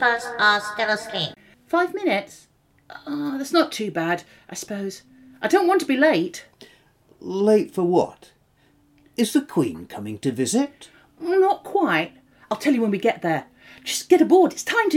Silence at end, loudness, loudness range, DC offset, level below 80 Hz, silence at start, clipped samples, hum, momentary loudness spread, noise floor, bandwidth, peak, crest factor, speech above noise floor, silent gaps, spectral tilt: 0 s; -22 LUFS; 4 LU; under 0.1%; -66 dBFS; 0 s; under 0.1%; none; 15 LU; -60 dBFS; 16.5 kHz; -4 dBFS; 18 dB; 39 dB; none; -4.5 dB/octave